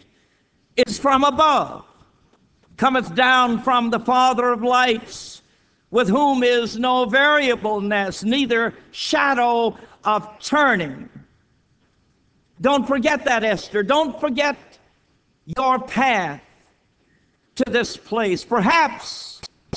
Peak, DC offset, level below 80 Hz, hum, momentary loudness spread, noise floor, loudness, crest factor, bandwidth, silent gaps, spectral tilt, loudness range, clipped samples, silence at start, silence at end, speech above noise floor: -4 dBFS; under 0.1%; -54 dBFS; none; 14 LU; -63 dBFS; -19 LUFS; 18 dB; 8 kHz; none; -4 dB/octave; 5 LU; under 0.1%; 0.75 s; 0 s; 44 dB